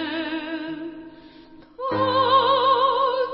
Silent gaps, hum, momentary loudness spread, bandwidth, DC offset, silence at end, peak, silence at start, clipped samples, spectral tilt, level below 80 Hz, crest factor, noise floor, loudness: none; none; 16 LU; 5.6 kHz; under 0.1%; 0 s; -6 dBFS; 0 s; under 0.1%; -9 dB/octave; -62 dBFS; 16 dB; -47 dBFS; -21 LUFS